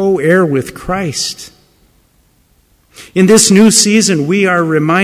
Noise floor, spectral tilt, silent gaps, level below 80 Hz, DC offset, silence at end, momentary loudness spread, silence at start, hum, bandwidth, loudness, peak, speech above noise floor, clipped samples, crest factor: -53 dBFS; -4 dB/octave; none; -44 dBFS; under 0.1%; 0 s; 13 LU; 0 s; none; 16 kHz; -10 LUFS; 0 dBFS; 42 dB; under 0.1%; 12 dB